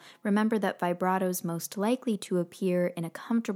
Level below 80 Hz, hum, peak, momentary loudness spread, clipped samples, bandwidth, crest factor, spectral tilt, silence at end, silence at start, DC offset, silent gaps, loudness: -86 dBFS; none; -12 dBFS; 5 LU; under 0.1%; 17 kHz; 16 dB; -6 dB/octave; 0 s; 0.05 s; under 0.1%; none; -29 LUFS